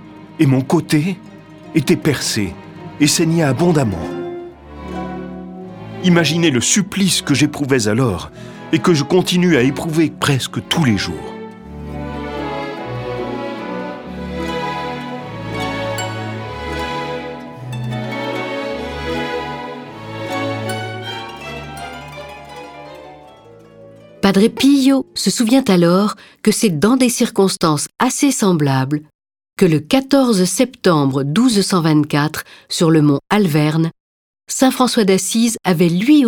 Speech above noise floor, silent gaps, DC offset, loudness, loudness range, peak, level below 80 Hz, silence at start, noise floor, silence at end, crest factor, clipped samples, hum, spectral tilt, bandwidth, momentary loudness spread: 27 dB; 29.15-29.19 s, 34.00-34.34 s; under 0.1%; -16 LUFS; 10 LU; 0 dBFS; -44 dBFS; 0 s; -42 dBFS; 0 s; 16 dB; under 0.1%; none; -5 dB/octave; 19 kHz; 17 LU